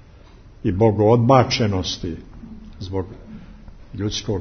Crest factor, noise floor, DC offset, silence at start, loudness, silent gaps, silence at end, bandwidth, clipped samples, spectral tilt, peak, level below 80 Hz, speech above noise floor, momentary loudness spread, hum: 20 dB; -45 dBFS; under 0.1%; 0.65 s; -19 LUFS; none; 0 s; 6.6 kHz; under 0.1%; -6 dB/octave; 0 dBFS; -42 dBFS; 26 dB; 25 LU; none